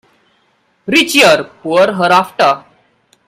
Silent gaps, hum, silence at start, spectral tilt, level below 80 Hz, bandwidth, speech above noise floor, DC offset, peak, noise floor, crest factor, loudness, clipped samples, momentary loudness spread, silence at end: none; none; 0.85 s; -3 dB/octave; -58 dBFS; 16.5 kHz; 47 dB; under 0.1%; 0 dBFS; -58 dBFS; 14 dB; -11 LUFS; 0.1%; 8 LU; 0.7 s